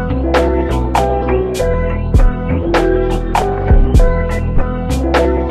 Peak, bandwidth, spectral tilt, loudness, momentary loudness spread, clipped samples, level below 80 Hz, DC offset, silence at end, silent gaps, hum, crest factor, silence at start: 0 dBFS; 13.5 kHz; -7 dB/octave; -15 LUFS; 5 LU; under 0.1%; -16 dBFS; under 0.1%; 0 s; none; none; 12 dB; 0 s